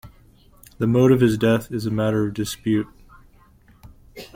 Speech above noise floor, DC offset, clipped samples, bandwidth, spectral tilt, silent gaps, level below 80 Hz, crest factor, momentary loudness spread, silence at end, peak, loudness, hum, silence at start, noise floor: 33 dB; under 0.1%; under 0.1%; 17 kHz; -7 dB/octave; none; -48 dBFS; 18 dB; 10 LU; 0.1 s; -4 dBFS; -20 LUFS; none; 0.05 s; -53 dBFS